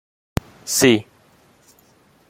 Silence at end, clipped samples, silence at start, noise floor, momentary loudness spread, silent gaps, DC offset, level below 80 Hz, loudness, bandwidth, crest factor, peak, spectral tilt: 1.25 s; under 0.1%; 0.65 s; -55 dBFS; 14 LU; none; under 0.1%; -46 dBFS; -19 LUFS; 16.5 kHz; 22 dB; -2 dBFS; -3.5 dB/octave